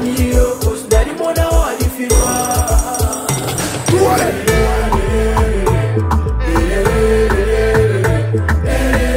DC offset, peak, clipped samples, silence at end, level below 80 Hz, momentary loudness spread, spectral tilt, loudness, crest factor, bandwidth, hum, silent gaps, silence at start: under 0.1%; 0 dBFS; under 0.1%; 0 s; -18 dBFS; 4 LU; -5 dB/octave; -15 LUFS; 14 dB; 16.5 kHz; none; none; 0 s